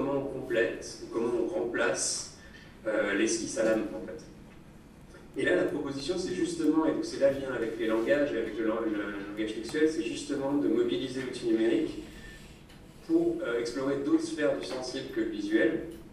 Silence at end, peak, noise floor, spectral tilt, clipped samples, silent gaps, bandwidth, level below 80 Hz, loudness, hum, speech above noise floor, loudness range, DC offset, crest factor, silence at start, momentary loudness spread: 0 s; -14 dBFS; -51 dBFS; -4 dB/octave; under 0.1%; none; 13 kHz; -56 dBFS; -30 LUFS; none; 22 dB; 2 LU; under 0.1%; 16 dB; 0 s; 13 LU